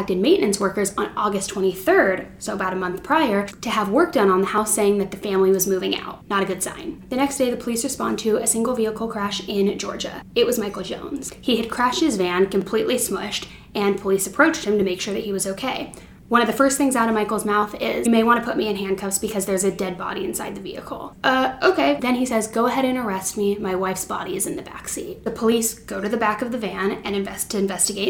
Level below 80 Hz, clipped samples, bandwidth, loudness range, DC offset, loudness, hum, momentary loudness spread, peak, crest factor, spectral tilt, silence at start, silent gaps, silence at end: -50 dBFS; under 0.1%; 18.5 kHz; 4 LU; under 0.1%; -21 LUFS; none; 10 LU; -2 dBFS; 20 dB; -3.5 dB/octave; 0 s; none; 0 s